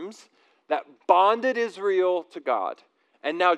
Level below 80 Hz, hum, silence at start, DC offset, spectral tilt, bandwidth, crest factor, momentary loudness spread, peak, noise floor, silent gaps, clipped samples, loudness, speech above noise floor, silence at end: under -90 dBFS; none; 0 s; under 0.1%; -4 dB/octave; 9.8 kHz; 20 dB; 14 LU; -4 dBFS; -58 dBFS; none; under 0.1%; -24 LUFS; 35 dB; 0 s